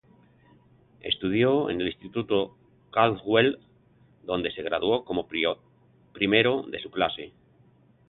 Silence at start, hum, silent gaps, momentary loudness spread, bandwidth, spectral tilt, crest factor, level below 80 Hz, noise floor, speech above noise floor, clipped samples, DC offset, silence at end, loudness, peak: 1.05 s; none; none; 14 LU; 4.3 kHz; -9.5 dB/octave; 22 dB; -58 dBFS; -60 dBFS; 34 dB; under 0.1%; under 0.1%; 0.8 s; -26 LUFS; -6 dBFS